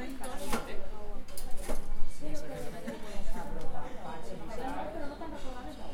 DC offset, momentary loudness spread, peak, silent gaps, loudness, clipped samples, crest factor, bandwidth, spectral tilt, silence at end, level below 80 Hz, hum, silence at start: under 0.1%; 7 LU; -12 dBFS; none; -42 LUFS; under 0.1%; 16 dB; 14.5 kHz; -5 dB/octave; 0 s; -38 dBFS; none; 0 s